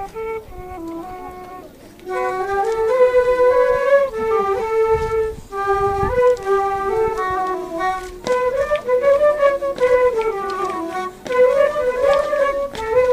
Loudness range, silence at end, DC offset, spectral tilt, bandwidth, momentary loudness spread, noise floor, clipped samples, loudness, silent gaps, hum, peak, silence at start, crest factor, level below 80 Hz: 3 LU; 0 s; under 0.1%; -5 dB/octave; 15.5 kHz; 16 LU; -39 dBFS; under 0.1%; -18 LUFS; none; none; -4 dBFS; 0 s; 14 dB; -40 dBFS